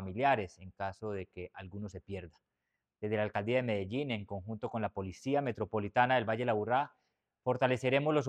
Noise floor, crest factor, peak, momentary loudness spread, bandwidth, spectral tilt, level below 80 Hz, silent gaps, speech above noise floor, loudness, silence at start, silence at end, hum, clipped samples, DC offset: -87 dBFS; 22 dB; -12 dBFS; 15 LU; 10.5 kHz; -6.5 dB/octave; -68 dBFS; none; 53 dB; -34 LUFS; 0 s; 0 s; none; under 0.1%; under 0.1%